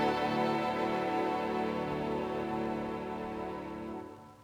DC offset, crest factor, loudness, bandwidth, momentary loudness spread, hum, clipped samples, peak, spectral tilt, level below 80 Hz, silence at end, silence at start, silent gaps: under 0.1%; 14 dB; -34 LUFS; over 20 kHz; 10 LU; 50 Hz at -55 dBFS; under 0.1%; -18 dBFS; -6.5 dB/octave; -58 dBFS; 0 s; 0 s; none